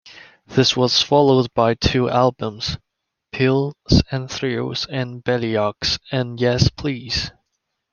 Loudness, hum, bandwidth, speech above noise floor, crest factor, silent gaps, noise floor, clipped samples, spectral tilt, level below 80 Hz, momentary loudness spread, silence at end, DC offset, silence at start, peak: -19 LUFS; none; 7.2 kHz; 56 dB; 18 dB; none; -75 dBFS; under 0.1%; -5.5 dB/octave; -38 dBFS; 10 LU; 0.65 s; under 0.1%; 0.05 s; 0 dBFS